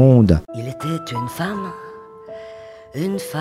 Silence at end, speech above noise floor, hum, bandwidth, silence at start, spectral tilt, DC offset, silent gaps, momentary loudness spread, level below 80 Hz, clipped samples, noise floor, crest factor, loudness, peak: 0 s; 21 dB; none; 15 kHz; 0 s; -7.5 dB/octave; under 0.1%; none; 22 LU; -38 dBFS; under 0.1%; -38 dBFS; 18 dB; -21 LUFS; 0 dBFS